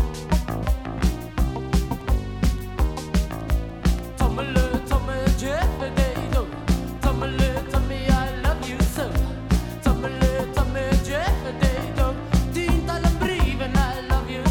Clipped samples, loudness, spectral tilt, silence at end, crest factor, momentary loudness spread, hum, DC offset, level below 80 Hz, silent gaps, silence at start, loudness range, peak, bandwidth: under 0.1%; -24 LUFS; -6 dB/octave; 0 s; 18 dB; 4 LU; none; under 0.1%; -24 dBFS; none; 0 s; 2 LU; -4 dBFS; 17.5 kHz